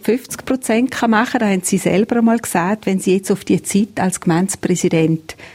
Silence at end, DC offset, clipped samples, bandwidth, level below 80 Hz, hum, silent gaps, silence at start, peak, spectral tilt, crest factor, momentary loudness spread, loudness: 0 s; under 0.1%; under 0.1%; 16.5 kHz; -52 dBFS; none; none; 0.05 s; -2 dBFS; -5.5 dB/octave; 14 dB; 4 LU; -17 LUFS